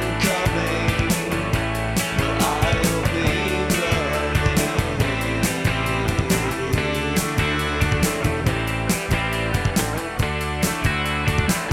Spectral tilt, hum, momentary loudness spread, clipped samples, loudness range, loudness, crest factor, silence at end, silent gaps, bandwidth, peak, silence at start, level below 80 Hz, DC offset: -4.5 dB/octave; none; 3 LU; under 0.1%; 1 LU; -21 LUFS; 14 dB; 0 s; none; 17 kHz; -6 dBFS; 0 s; -32 dBFS; under 0.1%